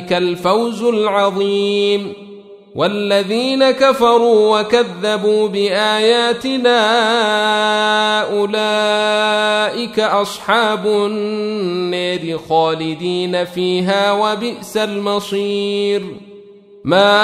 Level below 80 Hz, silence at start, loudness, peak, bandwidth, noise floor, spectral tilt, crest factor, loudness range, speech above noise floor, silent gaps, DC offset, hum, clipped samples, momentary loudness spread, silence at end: -58 dBFS; 0 s; -15 LUFS; 0 dBFS; 14.5 kHz; -40 dBFS; -4 dB/octave; 14 dB; 4 LU; 25 dB; none; under 0.1%; none; under 0.1%; 8 LU; 0 s